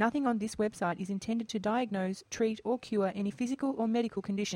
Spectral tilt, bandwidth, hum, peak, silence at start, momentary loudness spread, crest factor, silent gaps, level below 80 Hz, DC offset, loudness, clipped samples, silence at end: -5.5 dB/octave; 12 kHz; none; -16 dBFS; 0 s; 4 LU; 16 dB; none; -66 dBFS; under 0.1%; -33 LUFS; under 0.1%; 0 s